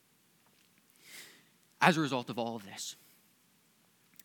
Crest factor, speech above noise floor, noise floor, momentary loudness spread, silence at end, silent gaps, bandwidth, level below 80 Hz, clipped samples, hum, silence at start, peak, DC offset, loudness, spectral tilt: 30 dB; 37 dB; -69 dBFS; 25 LU; 1.3 s; none; 19 kHz; under -90 dBFS; under 0.1%; none; 1.1 s; -6 dBFS; under 0.1%; -32 LUFS; -4.5 dB/octave